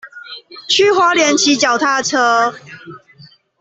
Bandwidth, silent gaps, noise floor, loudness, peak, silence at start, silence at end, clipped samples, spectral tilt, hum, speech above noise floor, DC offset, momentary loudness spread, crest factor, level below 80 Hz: 8.4 kHz; none; -45 dBFS; -13 LUFS; -2 dBFS; 0.05 s; 0.65 s; under 0.1%; -1.5 dB/octave; none; 31 dB; under 0.1%; 20 LU; 14 dB; -62 dBFS